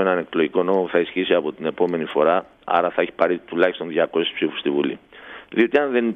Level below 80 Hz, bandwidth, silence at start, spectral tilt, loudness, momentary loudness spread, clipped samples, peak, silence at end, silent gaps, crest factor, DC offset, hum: -64 dBFS; 4.8 kHz; 0 s; -7.5 dB/octave; -21 LUFS; 6 LU; under 0.1%; -2 dBFS; 0 s; none; 18 dB; under 0.1%; none